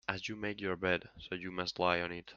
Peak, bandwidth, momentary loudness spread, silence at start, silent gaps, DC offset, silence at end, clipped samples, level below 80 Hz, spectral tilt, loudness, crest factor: -12 dBFS; 7.6 kHz; 9 LU; 0.1 s; none; under 0.1%; 0 s; under 0.1%; -66 dBFS; -5 dB/octave; -36 LUFS; 24 dB